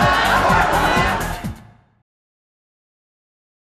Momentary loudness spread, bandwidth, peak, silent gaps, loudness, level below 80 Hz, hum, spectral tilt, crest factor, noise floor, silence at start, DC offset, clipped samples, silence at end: 13 LU; 14 kHz; -4 dBFS; none; -16 LUFS; -34 dBFS; none; -4.5 dB/octave; 16 dB; -41 dBFS; 0 s; under 0.1%; under 0.1%; 2.1 s